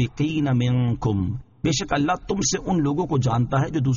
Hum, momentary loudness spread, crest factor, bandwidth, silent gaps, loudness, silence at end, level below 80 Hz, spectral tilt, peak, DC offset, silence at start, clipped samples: none; 3 LU; 12 dB; 7.4 kHz; none; -23 LUFS; 0 s; -44 dBFS; -6.5 dB/octave; -10 dBFS; under 0.1%; 0 s; under 0.1%